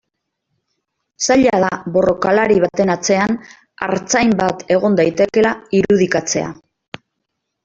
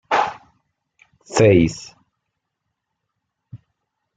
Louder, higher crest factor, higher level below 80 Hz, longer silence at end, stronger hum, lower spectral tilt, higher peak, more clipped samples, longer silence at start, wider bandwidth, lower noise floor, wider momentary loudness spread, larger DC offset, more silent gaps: about the same, -15 LUFS vs -17 LUFS; second, 14 dB vs 22 dB; about the same, -50 dBFS vs -50 dBFS; first, 1.1 s vs 0.6 s; neither; second, -4.5 dB/octave vs -6 dB/octave; about the same, -2 dBFS vs 0 dBFS; neither; first, 1.2 s vs 0.1 s; second, 8 kHz vs 9.4 kHz; about the same, -75 dBFS vs -78 dBFS; second, 12 LU vs 21 LU; neither; neither